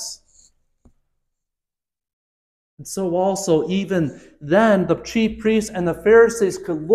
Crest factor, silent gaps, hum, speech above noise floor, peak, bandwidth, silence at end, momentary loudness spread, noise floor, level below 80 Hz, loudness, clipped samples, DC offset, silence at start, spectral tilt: 18 dB; 2.13-2.77 s; none; 71 dB; -4 dBFS; 14 kHz; 0 s; 17 LU; -89 dBFS; -50 dBFS; -19 LUFS; under 0.1%; under 0.1%; 0 s; -5.5 dB/octave